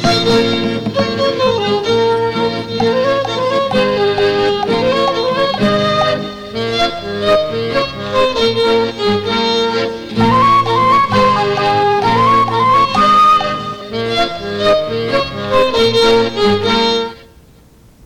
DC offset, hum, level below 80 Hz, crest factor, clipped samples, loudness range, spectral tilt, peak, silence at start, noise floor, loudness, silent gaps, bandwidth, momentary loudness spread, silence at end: under 0.1%; none; -40 dBFS; 10 dB; under 0.1%; 4 LU; -5 dB/octave; -4 dBFS; 0 s; -44 dBFS; -13 LUFS; none; 15.5 kHz; 7 LU; 0.8 s